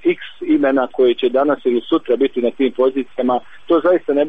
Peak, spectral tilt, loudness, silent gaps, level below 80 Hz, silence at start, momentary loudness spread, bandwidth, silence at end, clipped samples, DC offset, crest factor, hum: -4 dBFS; -7.5 dB/octave; -17 LUFS; none; -58 dBFS; 0.05 s; 5 LU; 4.5 kHz; 0 s; under 0.1%; 1%; 12 dB; none